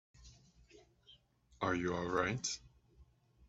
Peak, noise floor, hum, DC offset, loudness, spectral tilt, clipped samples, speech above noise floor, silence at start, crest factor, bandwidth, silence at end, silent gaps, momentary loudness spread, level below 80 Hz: -18 dBFS; -68 dBFS; none; under 0.1%; -38 LUFS; -4 dB/octave; under 0.1%; 30 dB; 0.2 s; 24 dB; 8.2 kHz; 0.45 s; none; 6 LU; -64 dBFS